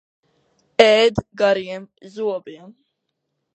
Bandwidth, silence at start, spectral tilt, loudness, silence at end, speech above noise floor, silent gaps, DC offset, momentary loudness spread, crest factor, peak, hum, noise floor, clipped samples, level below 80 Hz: 8.8 kHz; 0.8 s; -4 dB/octave; -18 LUFS; 0.85 s; 57 dB; none; under 0.1%; 20 LU; 20 dB; 0 dBFS; none; -76 dBFS; under 0.1%; -52 dBFS